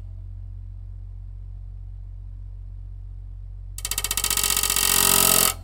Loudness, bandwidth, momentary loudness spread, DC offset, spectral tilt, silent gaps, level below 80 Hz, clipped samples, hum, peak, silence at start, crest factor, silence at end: -18 LUFS; 17.5 kHz; 25 LU; under 0.1%; -1 dB/octave; none; -38 dBFS; under 0.1%; none; -2 dBFS; 0 s; 24 dB; 0 s